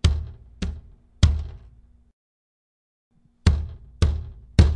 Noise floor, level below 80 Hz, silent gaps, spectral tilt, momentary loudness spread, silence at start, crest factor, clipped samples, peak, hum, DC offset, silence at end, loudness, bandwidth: -51 dBFS; -28 dBFS; 2.13-3.11 s; -6 dB/octave; 16 LU; 0.05 s; 22 dB; under 0.1%; -2 dBFS; none; under 0.1%; 0 s; -25 LUFS; 10.5 kHz